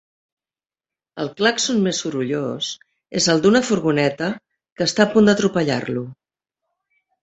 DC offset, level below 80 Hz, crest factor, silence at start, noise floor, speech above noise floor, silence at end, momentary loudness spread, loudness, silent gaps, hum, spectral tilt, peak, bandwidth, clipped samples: under 0.1%; -58 dBFS; 18 dB; 1.15 s; under -90 dBFS; over 71 dB; 1.1 s; 14 LU; -19 LUFS; 4.72-4.76 s; none; -4 dB/octave; -2 dBFS; 8.2 kHz; under 0.1%